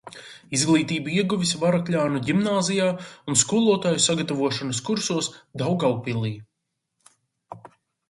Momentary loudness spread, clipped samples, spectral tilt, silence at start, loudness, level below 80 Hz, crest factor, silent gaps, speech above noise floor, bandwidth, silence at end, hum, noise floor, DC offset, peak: 12 LU; under 0.1%; -4 dB/octave; 0.05 s; -23 LUFS; -62 dBFS; 20 dB; none; 57 dB; 11.5 kHz; 0.45 s; none; -79 dBFS; under 0.1%; -4 dBFS